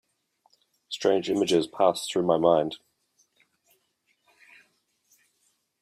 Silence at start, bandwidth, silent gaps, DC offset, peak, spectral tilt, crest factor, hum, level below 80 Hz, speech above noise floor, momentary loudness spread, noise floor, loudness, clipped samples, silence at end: 0.9 s; 15 kHz; none; under 0.1%; -8 dBFS; -5 dB/octave; 22 dB; none; -70 dBFS; 49 dB; 12 LU; -72 dBFS; -25 LUFS; under 0.1%; 3.05 s